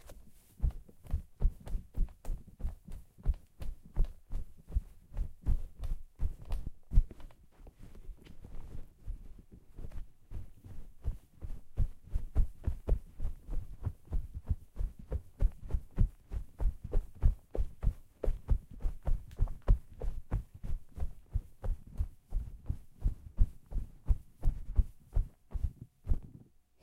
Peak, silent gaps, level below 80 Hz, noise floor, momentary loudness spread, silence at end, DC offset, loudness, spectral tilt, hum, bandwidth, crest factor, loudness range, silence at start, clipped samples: -12 dBFS; none; -36 dBFS; -58 dBFS; 17 LU; 0.5 s; under 0.1%; -40 LUFS; -8.5 dB/octave; none; 3.2 kHz; 22 dB; 6 LU; 0.1 s; under 0.1%